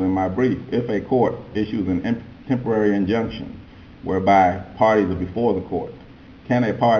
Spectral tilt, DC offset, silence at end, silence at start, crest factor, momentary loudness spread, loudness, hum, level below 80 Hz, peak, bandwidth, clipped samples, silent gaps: -8 dB/octave; under 0.1%; 0 s; 0 s; 16 dB; 12 LU; -21 LUFS; none; -44 dBFS; -4 dBFS; 6.8 kHz; under 0.1%; none